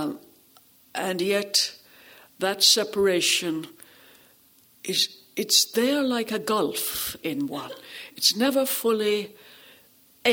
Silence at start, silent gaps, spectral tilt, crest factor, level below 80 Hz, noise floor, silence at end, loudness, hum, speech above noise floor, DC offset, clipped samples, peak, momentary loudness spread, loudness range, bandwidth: 0 s; none; -2 dB/octave; 20 dB; -66 dBFS; -58 dBFS; 0 s; -23 LUFS; none; 33 dB; under 0.1%; under 0.1%; -6 dBFS; 16 LU; 2 LU; over 20 kHz